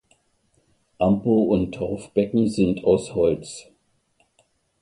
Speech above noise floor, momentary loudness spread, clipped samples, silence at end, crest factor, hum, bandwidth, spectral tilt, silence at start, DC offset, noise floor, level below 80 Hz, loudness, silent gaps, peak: 45 dB; 10 LU; under 0.1%; 1.2 s; 18 dB; none; 11.5 kHz; -7.5 dB/octave; 1 s; under 0.1%; -66 dBFS; -48 dBFS; -22 LUFS; none; -6 dBFS